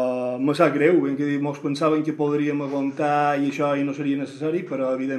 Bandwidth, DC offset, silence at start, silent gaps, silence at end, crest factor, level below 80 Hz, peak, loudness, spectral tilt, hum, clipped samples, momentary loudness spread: 11.5 kHz; under 0.1%; 0 s; none; 0 s; 18 dB; -78 dBFS; -4 dBFS; -23 LUFS; -7 dB/octave; none; under 0.1%; 7 LU